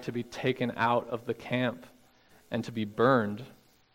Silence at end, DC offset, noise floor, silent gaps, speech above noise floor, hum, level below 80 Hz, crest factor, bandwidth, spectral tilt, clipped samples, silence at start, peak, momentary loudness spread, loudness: 0.45 s; under 0.1%; -61 dBFS; none; 31 dB; none; -68 dBFS; 22 dB; 16 kHz; -6.5 dB/octave; under 0.1%; 0 s; -10 dBFS; 12 LU; -30 LUFS